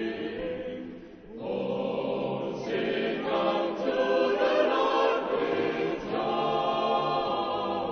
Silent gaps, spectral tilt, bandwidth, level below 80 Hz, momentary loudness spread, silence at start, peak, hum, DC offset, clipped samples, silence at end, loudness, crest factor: none; -6 dB/octave; 6.6 kHz; -60 dBFS; 10 LU; 0 s; -12 dBFS; none; under 0.1%; under 0.1%; 0 s; -28 LUFS; 16 dB